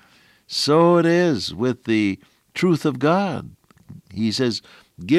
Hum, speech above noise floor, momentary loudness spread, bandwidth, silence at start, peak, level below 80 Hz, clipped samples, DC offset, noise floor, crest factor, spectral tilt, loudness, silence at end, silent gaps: none; 35 dB; 17 LU; 13.5 kHz; 0.5 s; -6 dBFS; -62 dBFS; under 0.1%; under 0.1%; -54 dBFS; 16 dB; -6 dB/octave; -20 LUFS; 0 s; none